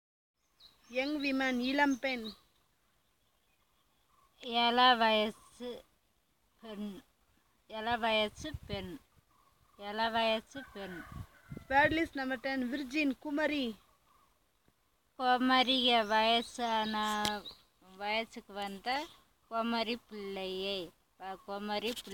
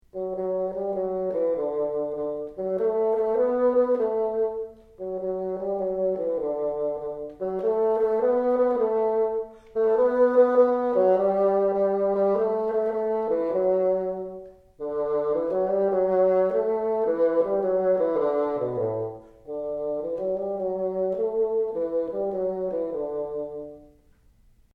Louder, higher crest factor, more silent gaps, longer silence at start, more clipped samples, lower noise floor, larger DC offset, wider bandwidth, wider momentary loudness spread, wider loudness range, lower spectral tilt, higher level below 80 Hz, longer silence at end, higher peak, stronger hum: second, -32 LUFS vs -25 LUFS; first, 22 dB vs 16 dB; neither; first, 0.65 s vs 0.15 s; neither; first, -75 dBFS vs -58 dBFS; neither; first, 17 kHz vs 4.7 kHz; first, 20 LU vs 11 LU; about the same, 8 LU vs 6 LU; second, -3.5 dB/octave vs -9.5 dB/octave; second, -64 dBFS vs -58 dBFS; second, 0 s vs 0.9 s; second, -14 dBFS vs -8 dBFS; neither